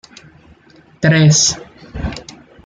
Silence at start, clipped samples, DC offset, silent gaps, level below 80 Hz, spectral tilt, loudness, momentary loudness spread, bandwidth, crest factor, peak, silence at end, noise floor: 1 s; under 0.1%; under 0.1%; none; -36 dBFS; -4 dB/octave; -13 LUFS; 21 LU; 9.4 kHz; 16 dB; -2 dBFS; 0.35 s; -47 dBFS